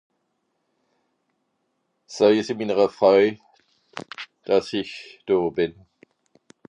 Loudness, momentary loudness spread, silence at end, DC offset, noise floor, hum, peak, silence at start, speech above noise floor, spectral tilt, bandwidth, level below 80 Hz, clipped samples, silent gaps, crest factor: -21 LUFS; 20 LU; 1 s; under 0.1%; -74 dBFS; none; -4 dBFS; 2.1 s; 53 dB; -5.5 dB/octave; 10 kHz; -64 dBFS; under 0.1%; none; 20 dB